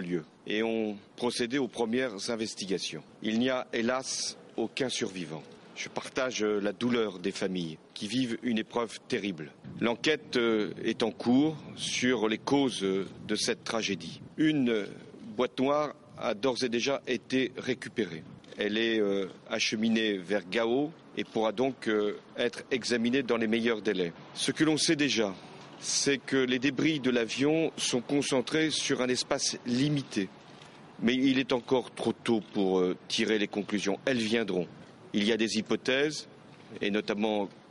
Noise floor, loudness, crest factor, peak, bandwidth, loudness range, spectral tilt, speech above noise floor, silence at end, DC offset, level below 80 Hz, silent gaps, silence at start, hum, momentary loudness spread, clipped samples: -51 dBFS; -30 LUFS; 20 dB; -10 dBFS; 11.5 kHz; 4 LU; -4 dB/octave; 21 dB; 0.1 s; under 0.1%; -68 dBFS; none; 0 s; none; 9 LU; under 0.1%